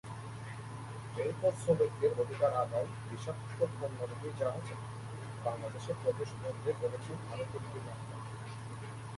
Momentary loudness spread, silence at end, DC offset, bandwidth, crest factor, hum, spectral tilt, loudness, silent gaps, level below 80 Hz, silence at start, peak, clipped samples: 13 LU; 0 s; under 0.1%; 11.5 kHz; 20 dB; none; -6.5 dB/octave; -37 LUFS; none; -64 dBFS; 0.05 s; -16 dBFS; under 0.1%